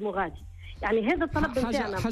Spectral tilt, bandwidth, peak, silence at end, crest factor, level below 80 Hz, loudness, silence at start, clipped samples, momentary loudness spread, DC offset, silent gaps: -6 dB/octave; 14 kHz; -14 dBFS; 0 s; 14 dB; -42 dBFS; -28 LUFS; 0 s; under 0.1%; 12 LU; under 0.1%; none